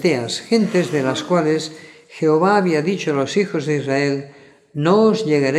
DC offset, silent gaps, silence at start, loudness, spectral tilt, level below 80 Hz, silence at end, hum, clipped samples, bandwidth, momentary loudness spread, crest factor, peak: under 0.1%; none; 0 s; -18 LUFS; -6 dB/octave; -70 dBFS; 0 s; none; under 0.1%; 12.5 kHz; 7 LU; 16 dB; -2 dBFS